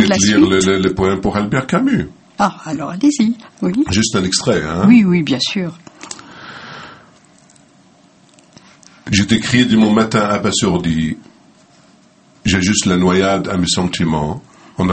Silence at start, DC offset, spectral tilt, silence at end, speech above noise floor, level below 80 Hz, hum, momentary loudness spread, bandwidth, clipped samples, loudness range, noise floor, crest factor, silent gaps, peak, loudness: 0 s; under 0.1%; -4.5 dB/octave; 0 s; 35 dB; -42 dBFS; none; 20 LU; 8.8 kHz; under 0.1%; 8 LU; -49 dBFS; 16 dB; none; 0 dBFS; -15 LUFS